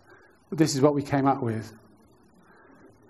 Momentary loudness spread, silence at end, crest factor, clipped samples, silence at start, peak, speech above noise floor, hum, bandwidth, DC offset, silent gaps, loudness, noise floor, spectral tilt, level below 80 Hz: 15 LU; 1.35 s; 22 dB; under 0.1%; 0.5 s; -6 dBFS; 34 dB; none; 13 kHz; under 0.1%; none; -25 LUFS; -58 dBFS; -6 dB/octave; -64 dBFS